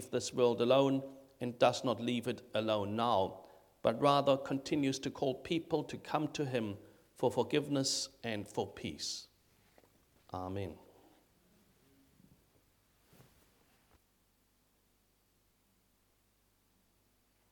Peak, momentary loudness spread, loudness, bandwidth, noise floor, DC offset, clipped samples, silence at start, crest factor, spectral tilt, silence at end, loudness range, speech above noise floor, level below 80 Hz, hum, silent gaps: -14 dBFS; 14 LU; -35 LUFS; 19 kHz; -74 dBFS; under 0.1%; under 0.1%; 0 s; 24 dB; -4.5 dB/octave; 6.75 s; 16 LU; 40 dB; -72 dBFS; none; none